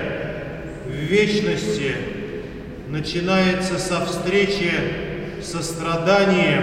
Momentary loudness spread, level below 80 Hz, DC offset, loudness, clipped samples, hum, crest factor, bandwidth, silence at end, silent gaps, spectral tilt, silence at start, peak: 14 LU; -42 dBFS; under 0.1%; -21 LUFS; under 0.1%; none; 18 dB; 15.5 kHz; 0 s; none; -5 dB/octave; 0 s; -4 dBFS